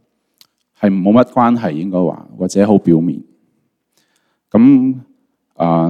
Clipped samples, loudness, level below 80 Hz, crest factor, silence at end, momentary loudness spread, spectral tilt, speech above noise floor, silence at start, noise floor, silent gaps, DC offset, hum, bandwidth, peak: under 0.1%; -13 LUFS; -54 dBFS; 14 dB; 0 s; 11 LU; -8 dB/octave; 52 dB; 0.8 s; -65 dBFS; none; under 0.1%; none; 9.8 kHz; 0 dBFS